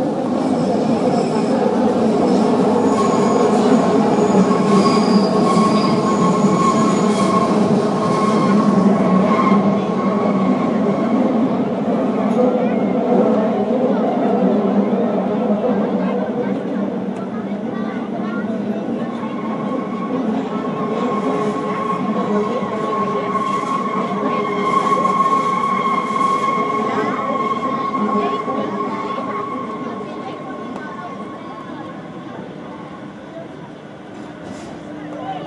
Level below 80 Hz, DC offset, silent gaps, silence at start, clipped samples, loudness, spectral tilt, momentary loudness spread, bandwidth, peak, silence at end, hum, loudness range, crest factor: -60 dBFS; under 0.1%; none; 0 s; under 0.1%; -17 LUFS; -7 dB/octave; 16 LU; 11.5 kHz; -4 dBFS; 0 s; none; 13 LU; 14 dB